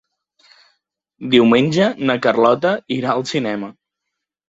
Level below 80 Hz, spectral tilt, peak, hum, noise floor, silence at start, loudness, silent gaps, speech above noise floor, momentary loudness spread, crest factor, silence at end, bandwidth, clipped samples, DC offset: -60 dBFS; -6 dB/octave; -2 dBFS; none; -80 dBFS; 1.2 s; -16 LUFS; none; 64 dB; 12 LU; 18 dB; 0.8 s; 8 kHz; under 0.1%; under 0.1%